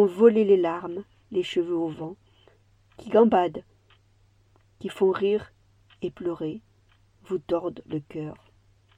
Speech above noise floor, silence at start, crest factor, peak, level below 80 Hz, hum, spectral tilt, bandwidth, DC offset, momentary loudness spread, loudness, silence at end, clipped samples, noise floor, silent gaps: 37 dB; 0 s; 22 dB; -6 dBFS; -64 dBFS; none; -7.5 dB/octave; 10 kHz; under 0.1%; 19 LU; -25 LUFS; 0.65 s; under 0.1%; -61 dBFS; none